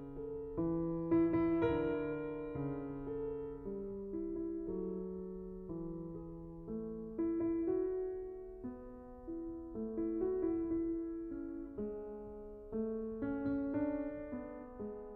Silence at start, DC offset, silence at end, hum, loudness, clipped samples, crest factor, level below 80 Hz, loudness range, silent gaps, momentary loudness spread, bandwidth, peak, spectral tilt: 0 s; under 0.1%; 0 s; none; -40 LUFS; under 0.1%; 18 dB; -56 dBFS; 6 LU; none; 13 LU; 4.1 kHz; -22 dBFS; -9 dB/octave